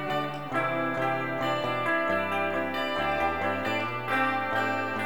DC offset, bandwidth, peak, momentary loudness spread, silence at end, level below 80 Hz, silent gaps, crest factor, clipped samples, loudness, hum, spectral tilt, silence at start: 0.5%; over 20 kHz; -14 dBFS; 3 LU; 0 s; -58 dBFS; none; 14 dB; under 0.1%; -28 LUFS; none; -5.5 dB/octave; 0 s